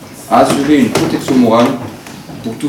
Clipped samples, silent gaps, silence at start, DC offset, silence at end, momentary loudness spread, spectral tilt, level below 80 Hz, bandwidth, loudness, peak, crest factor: under 0.1%; none; 0 s; under 0.1%; 0 s; 17 LU; -5.5 dB/octave; -46 dBFS; 17.5 kHz; -11 LUFS; 0 dBFS; 12 dB